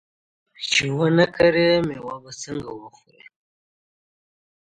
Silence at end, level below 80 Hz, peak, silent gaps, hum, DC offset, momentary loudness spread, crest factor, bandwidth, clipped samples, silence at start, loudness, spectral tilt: 1.8 s; -54 dBFS; -4 dBFS; none; none; under 0.1%; 17 LU; 20 dB; 9.2 kHz; under 0.1%; 0.6 s; -20 LUFS; -4.5 dB/octave